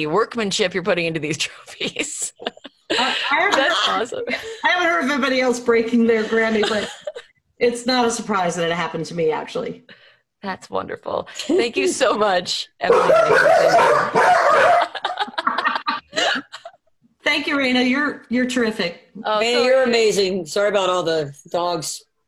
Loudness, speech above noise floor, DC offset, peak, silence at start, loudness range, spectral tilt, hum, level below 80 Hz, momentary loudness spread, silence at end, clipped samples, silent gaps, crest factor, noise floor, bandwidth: -19 LUFS; 40 dB; under 0.1%; -2 dBFS; 0 s; 7 LU; -3 dB/octave; none; -58 dBFS; 13 LU; 0.3 s; under 0.1%; none; 18 dB; -59 dBFS; 13 kHz